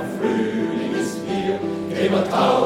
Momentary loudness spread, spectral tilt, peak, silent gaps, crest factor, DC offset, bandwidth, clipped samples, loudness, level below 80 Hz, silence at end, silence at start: 6 LU; -5.5 dB/octave; -6 dBFS; none; 16 dB; under 0.1%; 16 kHz; under 0.1%; -22 LUFS; -58 dBFS; 0 s; 0 s